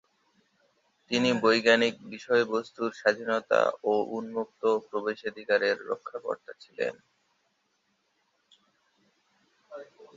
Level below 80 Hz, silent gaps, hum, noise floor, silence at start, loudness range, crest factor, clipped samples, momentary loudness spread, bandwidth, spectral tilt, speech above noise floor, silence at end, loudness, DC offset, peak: -76 dBFS; none; none; -74 dBFS; 1.1 s; 15 LU; 22 dB; under 0.1%; 15 LU; 7.8 kHz; -4 dB/octave; 46 dB; 0.1 s; -28 LUFS; under 0.1%; -8 dBFS